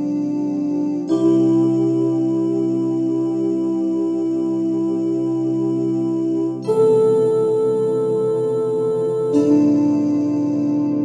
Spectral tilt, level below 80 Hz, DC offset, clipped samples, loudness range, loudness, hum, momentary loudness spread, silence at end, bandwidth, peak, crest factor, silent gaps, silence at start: -9 dB/octave; -72 dBFS; under 0.1%; under 0.1%; 3 LU; -19 LUFS; none; 5 LU; 0 s; 9.8 kHz; -4 dBFS; 12 dB; none; 0 s